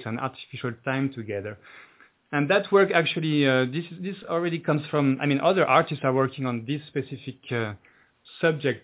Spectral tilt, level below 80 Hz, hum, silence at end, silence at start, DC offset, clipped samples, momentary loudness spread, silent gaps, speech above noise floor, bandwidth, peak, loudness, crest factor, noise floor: -10.5 dB/octave; -66 dBFS; none; 0.05 s; 0 s; under 0.1%; under 0.1%; 14 LU; none; 28 dB; 4 kHz; -4 dBFS; -25 LUFS; 20 dB; -53 dBFS